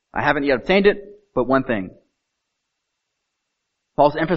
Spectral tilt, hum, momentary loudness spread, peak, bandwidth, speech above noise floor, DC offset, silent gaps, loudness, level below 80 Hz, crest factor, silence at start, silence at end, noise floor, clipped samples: -4 dB/octave; none; 13 LU; -2 dBFS; 6 kHz; 59 dB; under 0.1%; none; -19 LUFS; -46 dBFS; 20 dB; 0.15 s; 0 s; -77 dBFS; under 0.1%